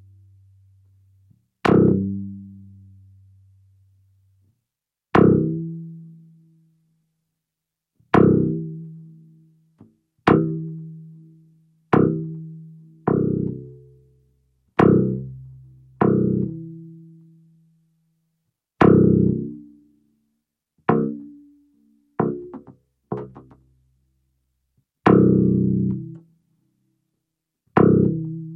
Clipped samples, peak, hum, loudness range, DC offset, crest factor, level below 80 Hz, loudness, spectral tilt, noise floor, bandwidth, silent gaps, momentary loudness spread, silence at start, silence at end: under 0.1%; 0 dBFS; none; 7 LU; under 0.1%; 22 dB; -52 dBFS; -20 LUFS; -10 dB/octave; -85 dBFS; 6 kHz; none; 24 LU; 1.65 s; 0 s